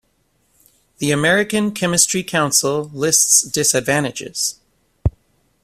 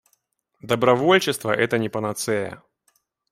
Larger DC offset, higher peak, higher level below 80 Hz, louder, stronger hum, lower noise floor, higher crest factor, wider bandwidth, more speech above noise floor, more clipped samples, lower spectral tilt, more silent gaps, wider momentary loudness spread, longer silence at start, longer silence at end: neither; about the same, 0 dBFS vs -2 dBFS; first, -40 dBFS vs -62 dBFS; first, -16 LUFS vs -21 LUFS; neither; second, -63 dBFS vs -69 dBFS; about the same, 20 dB vs 20 dB; about the same, 16 kHz vs 16 kHz; about the same, 46 dB vs 48 dB; neither; second, -2.5 dB/octave vs -4.5 dB/octave; neither; first, 12 LU vs 9 LU; first, 1 s vs 0.65 s; second, 0.55 s vs 0.75 s